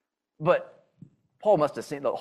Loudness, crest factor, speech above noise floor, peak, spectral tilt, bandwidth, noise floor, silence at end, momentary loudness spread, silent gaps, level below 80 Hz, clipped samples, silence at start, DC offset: -26 LUFS; 20 dB; 30 dB; -8 dBFS; -6.5 dB/octave; 13 kHz; -55 dBFS; 0 s; 7 LU; none; -70 dBFS; under 0.1%; 0.4 s; under 0.1%